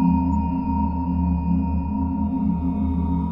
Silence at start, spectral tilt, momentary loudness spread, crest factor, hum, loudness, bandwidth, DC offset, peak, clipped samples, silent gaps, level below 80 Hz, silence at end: 0 s; -12 dB/octave; 2 LU; 12 dB; none; -23 LUFS; 3 kHz; under 0.1%; -10 dBFS; under 0.1%; none; -30 dBFS; 0 s